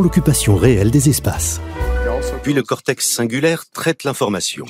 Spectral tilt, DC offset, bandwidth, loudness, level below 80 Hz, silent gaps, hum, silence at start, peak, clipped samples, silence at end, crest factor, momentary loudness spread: -5 dB/octave; under 0.1%; 16 kHz; -17 LUFS; -28 dBFS; none; none; 0 s; -2 dBFS; under 0.1%; 0 s; 16 dB; 8 LU